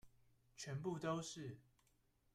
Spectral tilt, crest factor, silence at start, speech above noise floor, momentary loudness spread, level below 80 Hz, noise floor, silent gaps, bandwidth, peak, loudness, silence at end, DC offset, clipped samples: -5 dB/octave; 20 dB; 0.05 s; 32 dB; 16 LU; -78 dBFS; -79 dBFS; none; 14 kHz; -30 dBFS; -47 LUFS; 0.75 s; under 0.1%; under 0.1%